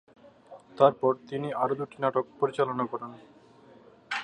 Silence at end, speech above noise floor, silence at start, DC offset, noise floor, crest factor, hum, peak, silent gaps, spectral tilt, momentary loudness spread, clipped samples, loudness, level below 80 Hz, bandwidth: 0 s; 27 dB; 0.5 s; under 0.1%; -55 dBFS; 24 dB; none; -6 dBFS; none; -6.5 dB/octave; 13 LU; under 0.1%; -28 LUFS; -74 dBFS; 10 kHz